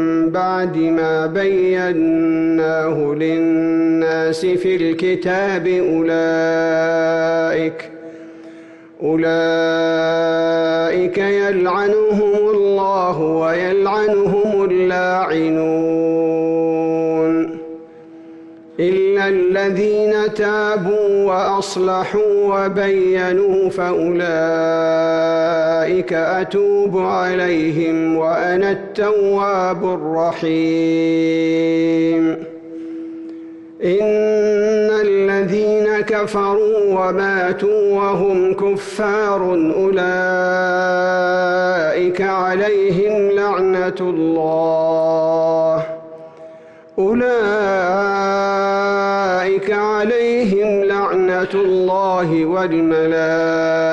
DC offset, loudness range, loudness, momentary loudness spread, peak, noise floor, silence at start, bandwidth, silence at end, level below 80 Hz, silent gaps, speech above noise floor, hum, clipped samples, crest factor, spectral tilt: under 0.1%; 2 LU; -16 LUFS; 3 LU; -8 dBFS; -40 dBFS; 0 s; 9.2 kHz; 0 s; -54 dBFS; none; 24 dB; none; under 0.1%; 8 dB; -6.5 dB/octave